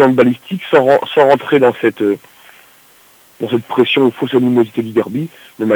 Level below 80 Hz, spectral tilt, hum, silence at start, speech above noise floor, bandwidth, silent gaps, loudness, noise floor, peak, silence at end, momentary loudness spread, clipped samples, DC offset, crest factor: -62 dBFS; -7 dB/octave; none; 0 s; 34 dB; over 20 kHz; none; -14 LUFS; -47 dBFS; 0 dBFS; 0 s; 11 LU; 0.1%; under 0.1%; 14 dB